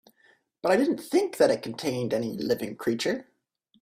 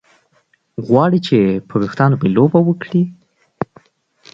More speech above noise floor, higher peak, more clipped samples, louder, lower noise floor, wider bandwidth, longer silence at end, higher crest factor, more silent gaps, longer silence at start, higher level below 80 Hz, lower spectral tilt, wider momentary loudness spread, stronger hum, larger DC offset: about the same, 43 dB vs 46 dB; second, -8 dBFS vs 0 dBFS; neither; second, -27 LUFS vs -15 LUFS; first, -69 dBFS vs -60 dBFS; first, 16 kHz vs 7.6 kHz; about the same, 0.6 s vs 0.7 s; about the same, 20 dB vs 16 dB; neither; second, 0.65 s vs 0.8 s; second, -68 dBFS vs -54 dBFS; second, -5 dB/octave vs -9 dB/octave; second, 7 LU vs 15 LU; neither; neither